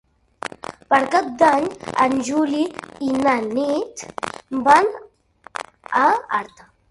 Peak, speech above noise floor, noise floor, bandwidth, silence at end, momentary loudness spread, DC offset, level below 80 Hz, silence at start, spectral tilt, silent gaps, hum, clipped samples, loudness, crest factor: 0 dBFS; 30 dB; -49 dBFS; 11.5 kHz; 0.45 s; 18 LU; under 0.1%; -58 dBFS; 0.9 s; -4 dB/octave; none; none; under 0.1%; -19 LUFS; 20 dB